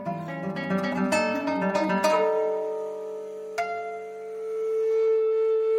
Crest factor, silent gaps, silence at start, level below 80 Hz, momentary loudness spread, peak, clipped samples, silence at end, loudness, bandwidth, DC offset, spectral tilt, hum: 16 dB; none; 0 s; -74 dBFS; 12 LU; -8 dBFS; under 0.1%; 0 s; -26 LUFS; 15 kHz; under 0.1%; -5.5 dB/octave; none